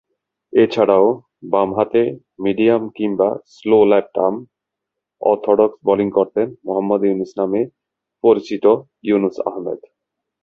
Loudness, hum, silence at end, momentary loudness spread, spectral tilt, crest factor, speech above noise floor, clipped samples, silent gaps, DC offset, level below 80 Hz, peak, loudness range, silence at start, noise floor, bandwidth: -17 LUFS; none; 0.65 s; 10 LU; -8 dB/octave; 16 dB; 65 dB; under 0.1%; none; under 0.1%; -60 dBFS; -2 dBFS; 2 LU; 0.55 s; -82 dBFS; 6.8 kHz